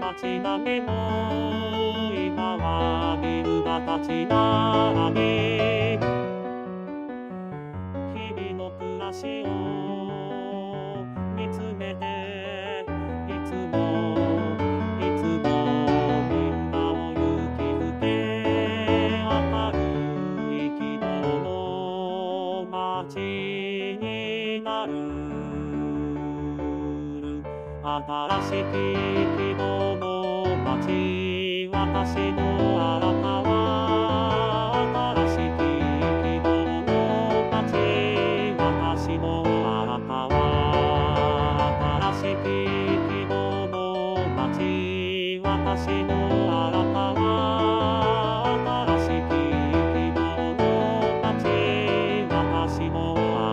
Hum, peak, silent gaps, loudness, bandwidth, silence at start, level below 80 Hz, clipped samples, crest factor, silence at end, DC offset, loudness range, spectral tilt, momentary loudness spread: none; -8 dBFS; none; -25 LUFS; 9.4 kHz; 0 s; -40 dBFS; under 0.1%; 16 dB; 0 s; under 0.1%; 7 LU; -7.5 dB/octave; 9 LU